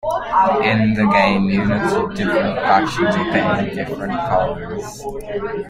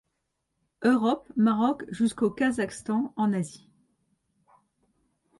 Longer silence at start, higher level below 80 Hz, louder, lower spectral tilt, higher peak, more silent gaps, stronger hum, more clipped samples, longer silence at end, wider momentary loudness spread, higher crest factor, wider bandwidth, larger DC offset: second, 0.05 s vs 0.8 s; first, -40 dBFS vs -66 dBFS; first, -17 LUFS vs -26 LUFS; about the same, -6.5 dB/octave vs -6 dB/octave; first, -2 dBFS vs -12 dBFS; neither; neither; neither; second, 0 s vs 1.85 s; first, 12 LU vs 6 LU; about the same, 16 dB vs 16 dB; first, 14.5 kHz vs 11.5 kHz; neither